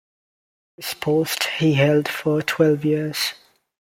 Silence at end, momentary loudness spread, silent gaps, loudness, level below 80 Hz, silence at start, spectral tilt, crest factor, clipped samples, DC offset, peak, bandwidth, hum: 0.65 s; 8 LU; none; -20 LUFS; -62 dBFS; 0.8 s; -5 dB/octave; 18 dB; under 0.1%; under 0.1%; -4 dBFS; 16.5 kHz; none